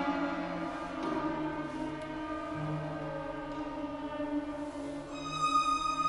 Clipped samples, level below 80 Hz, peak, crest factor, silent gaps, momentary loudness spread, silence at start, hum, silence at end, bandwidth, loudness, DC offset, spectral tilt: under 0.1%; -56 dBFS; -18 dBFS; 18 dB; none; 10 LU; 0 s; none; 0 s; 11.5 kHz; -35 LUFS; under 0.1%; -5 dB/octave